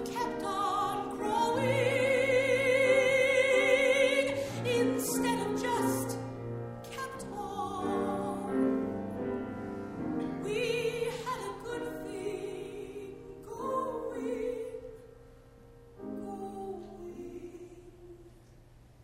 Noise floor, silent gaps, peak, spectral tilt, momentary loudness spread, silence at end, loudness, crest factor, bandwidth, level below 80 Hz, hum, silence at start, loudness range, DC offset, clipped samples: -56 dBFS; none; -14 dBFS; -4.5 dB/octave; 18 LU; 0.3 s; -31 LUFS; 18 dB; 16 kHz; -60 dBFS; none; 0 s; 16 LU; under 0.1%; under 0.1%